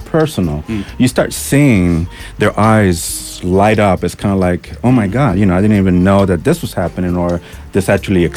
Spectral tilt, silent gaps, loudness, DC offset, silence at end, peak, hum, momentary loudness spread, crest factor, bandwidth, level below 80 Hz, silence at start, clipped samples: -6.5 dB/octave; none; -13 LUFS; under 0.1%; 0 s; -2 dBFS; none; 8 LU; 12 dB; 16 kHz; -32 dBFS; 0 s; under 0.1%